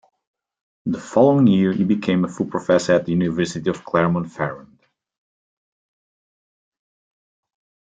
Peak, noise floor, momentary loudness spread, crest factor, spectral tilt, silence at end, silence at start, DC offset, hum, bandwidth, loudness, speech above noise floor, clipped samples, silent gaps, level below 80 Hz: -2 dBFS; under -90 dBFS; 12 LU; 20 dB; -7 dB/octave; 3.4 s; 0.85 s; under 0.1%; none; 9.2 kHz; -19 LUFS; over 72 dB; under 0.1%; none; -60 dBFS